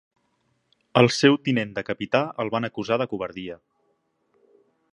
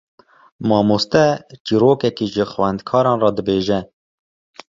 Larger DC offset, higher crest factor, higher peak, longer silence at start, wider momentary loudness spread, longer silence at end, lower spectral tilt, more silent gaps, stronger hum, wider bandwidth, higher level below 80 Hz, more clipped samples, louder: neither; first, 24 dB vs 16 dB; about the same, -2 dBFS vs -2 dBFS; first, 0.95 s vs 0.6 s; first, 15 LU vs 6 LU; first, 1.35 s vs 0.85 s; about the same, -5.5 dB/octave vs -6.5 dB/octave; second, none vs 1.60-1.65 s; neither; first, 11.5 kHz vs 7.6 kHz; second, -64 dBFS vs -50 dBFS; neither; second, -23 LUFS vs -17 LUFS